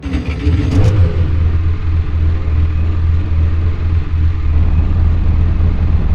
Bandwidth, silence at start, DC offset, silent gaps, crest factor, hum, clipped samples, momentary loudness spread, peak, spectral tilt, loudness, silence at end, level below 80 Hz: 5.6 kHz; 0 s; 2%; none; 12 dB; none; under 0.1%; 4 LU; 0 dBFS; -8.5 dB/octave; -15 LUFS; 0 s; -16 dBFS